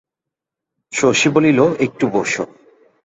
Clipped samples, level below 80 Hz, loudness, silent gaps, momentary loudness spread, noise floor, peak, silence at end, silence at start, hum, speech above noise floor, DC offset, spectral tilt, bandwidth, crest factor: under 0.1%; -56 dBFS; -16 LUFS; none; 11 LU; -84 dBFS; -2 dBFS; 0.6 s; 0.9 s; none; 69 dB; under 0.1%; -4.5 dB/octave; 8.2 kHz; 16 dB